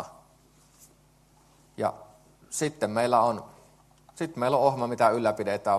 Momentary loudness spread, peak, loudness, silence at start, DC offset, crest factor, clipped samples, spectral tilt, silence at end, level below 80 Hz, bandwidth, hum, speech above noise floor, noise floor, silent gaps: 12 LU; -8 dBFS; -27 LUFS; 0 s; under 0.1%; 22 dB; under 0.1%; -5 dB/octave; 0 s; -66 dBFS; 13 kHz; none; 35 dB; -60 dBFS; none